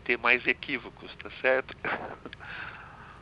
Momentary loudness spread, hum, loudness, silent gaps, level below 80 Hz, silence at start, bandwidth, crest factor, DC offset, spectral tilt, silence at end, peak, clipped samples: 20 LU; none; -28 LUFS; none; -58 dBFS; 0 s; 7 kHz; 26 dB; under 0.1%; -6 dB/octave; 0 s; -6 dBFS; under 0.1%